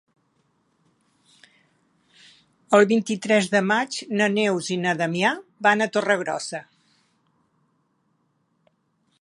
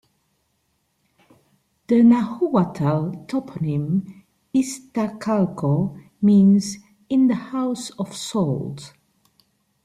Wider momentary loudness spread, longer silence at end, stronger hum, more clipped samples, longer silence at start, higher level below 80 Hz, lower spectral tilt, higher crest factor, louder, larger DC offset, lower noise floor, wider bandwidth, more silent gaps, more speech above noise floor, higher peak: second, 8 LU vs 14 LU; first, 2.6 s vs 0.95 s; neither; neither; first, 2.7 s vs 1.9 s; second, -76 dBFS vs -60 dBFS; second, -4.5 dB/octave vs -7 dB/octave; first, 22 dB vs 16 dB; about the same, -22 LUFS vs -21 LUFS; neither; about the same, -69 dBFS vs -69 dBFS; about the same, 11.5 kHz vs 12.5 kHz; neither; about the same, 48 dB vs 50 dB; first, -2 dBFS vs -6 dBFS